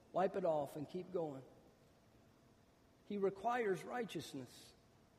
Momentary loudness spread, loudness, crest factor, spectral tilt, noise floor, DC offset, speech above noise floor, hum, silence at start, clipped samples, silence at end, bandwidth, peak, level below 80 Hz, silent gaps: 18 LU; -42 LUFS; 18 dB; -6 dB/octave; -70 dBFS; under 0.1%; 28 dB; none; 0.15 s; under 0.1%; 0.45 s; 15 kHz; -24 dBFS; -80 dBFS; none